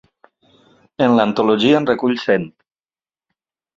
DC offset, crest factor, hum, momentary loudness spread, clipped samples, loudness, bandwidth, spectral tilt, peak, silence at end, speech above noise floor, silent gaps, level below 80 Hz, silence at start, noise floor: under 0.1%; 18 dB; none; 5 LU; under 0.1%; -16 LUFS; 7.6 kHz; -6.5 dB/octave; 0 dBFS; 1.3 s; over 75 dB; none; -60 dBFS; 1 s; under -90 dBFS